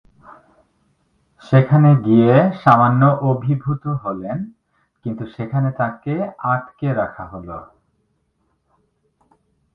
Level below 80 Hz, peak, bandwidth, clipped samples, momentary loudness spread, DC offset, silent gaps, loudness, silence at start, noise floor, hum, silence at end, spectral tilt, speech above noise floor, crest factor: -54 dBFS; 0 dBFS; 5.2 kHz; under 0.1%; 19 LU; under 0.1%; none; -17 LUFS; 1.5 s; -67 dBFS; none; 2.1 s; -10.5 dB/octave; 50 dB; 18 dB